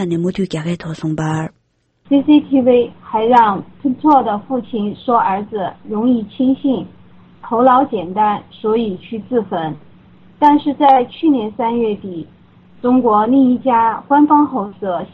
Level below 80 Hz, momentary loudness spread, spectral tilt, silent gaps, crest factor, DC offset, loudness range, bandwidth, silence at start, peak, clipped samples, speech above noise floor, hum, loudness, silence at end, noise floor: -52 dBFS; 11 LU; -7.5 dB/octave; none; 16 dB; under 0.1%; 3 LU; 8.4 kHz; 0 s; 0 dBFS; under 0.1%; 44 dB; none; -15 LUFS; 0.05 s; -58 dBFS